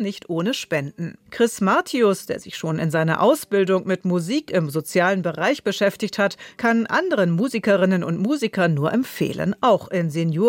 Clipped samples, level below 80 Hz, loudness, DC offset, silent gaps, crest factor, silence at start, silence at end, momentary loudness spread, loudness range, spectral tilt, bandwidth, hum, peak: under 0.1%; -64 dBFS; -21 LUFS; under 0.1%; none; 14 dB; 0 s; 0 s; 7 LU; 1 LU; -6 dB/octave; 17 kHz; none; -6 dBFS